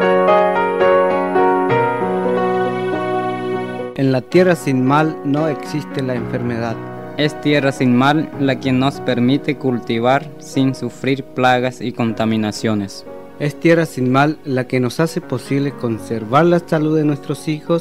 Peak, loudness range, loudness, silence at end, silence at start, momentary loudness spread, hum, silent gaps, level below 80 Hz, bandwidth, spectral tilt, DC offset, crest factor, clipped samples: -2 dBFS; 2 LU; -17 LUFS; 0 s; 0 s; 9 LU; none; none; -54 dBFS; 15.5 kHz; -6.5 dB/octave; 0.7%; 16 dB; under 0.1%